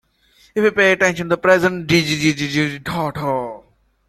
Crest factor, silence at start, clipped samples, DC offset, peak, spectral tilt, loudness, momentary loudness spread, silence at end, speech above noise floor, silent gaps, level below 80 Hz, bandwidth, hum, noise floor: 18 dB; 0.55 s; under 0.1%; under 0.1%; 0 dBFS; -5 dB/octave; -17 LUFS; 9 LU; 0.5 s; 38 dB; none; -52 dBFS; 14 kHz; none; -55 dBFS